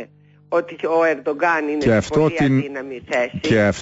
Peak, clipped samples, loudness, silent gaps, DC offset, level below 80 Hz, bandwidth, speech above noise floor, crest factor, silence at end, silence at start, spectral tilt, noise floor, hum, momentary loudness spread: -6 dBFS; under 0.1%; -19 LUFS; none; under 0.1%; -46 dBFS; 8 kHz; 24 dB; 14 dB; 0 s; 0 s; -6.5 dB/octave; -43 dBFS; 50 Hz at -45 dBFS; 6 LU